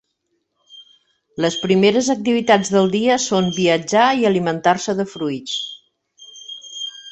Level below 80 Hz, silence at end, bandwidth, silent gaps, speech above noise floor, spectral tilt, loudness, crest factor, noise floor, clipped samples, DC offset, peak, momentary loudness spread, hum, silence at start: -60 dBFS; 0 s; 8.4 kHz; none; 54 dB; -4.5 dB/octave; -18 LUFS; 18 dB; -71 dBFS; under 0.1%; under 0.1%; -2 dBFS; 16 LU; none; 0.75 s